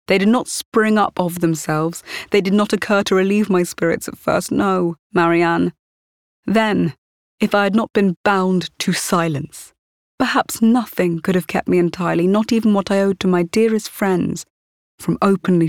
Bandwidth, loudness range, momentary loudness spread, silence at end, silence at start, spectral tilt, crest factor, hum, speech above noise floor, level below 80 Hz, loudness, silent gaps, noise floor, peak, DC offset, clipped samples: 17.5 kHz; 2 LU; 7 LU; 0 s; 0.1 s; -5.5 dB/octave; 16 dB; none; over 73 dB; -54 dBFS; -18 LUFS; 0.65-0.72 s, 4.99-5.10 s, 5.79-6.43 s, 6.98-7.38 s, 8.17-8.24 s, 9.79-10.18 s, 14.50-14.98 s; under -90 dBFS; -2 dBFS; 0.1%; under 0.1%